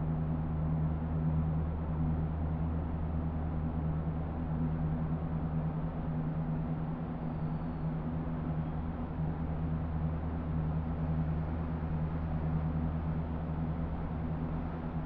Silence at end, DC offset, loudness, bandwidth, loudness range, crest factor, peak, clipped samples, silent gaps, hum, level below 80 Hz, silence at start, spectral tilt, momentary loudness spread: 0 s; under 0.1%; -35 LUFS; 3.9 kHz; 2 LU; 12 dB; -22 dBFS; under 0.1%; none; none; -40 dBFS; 0 s; -10 dB/octave; 3 LU